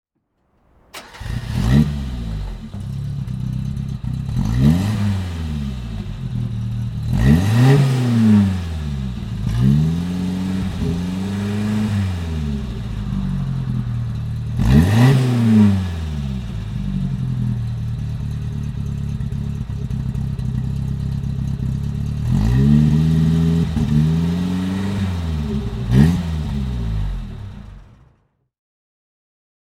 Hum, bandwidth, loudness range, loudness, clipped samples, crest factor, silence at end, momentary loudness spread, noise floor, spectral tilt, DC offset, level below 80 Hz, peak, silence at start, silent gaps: none; 14 kHz; 7 LU; -20 LUFS; under 0.1%; 18 dB; 1.95 s; 13 LU; -67 dBFS; -8 dB/octave; under 0.1%; -28 dBFS; 0 dBFS; 0.95 s; none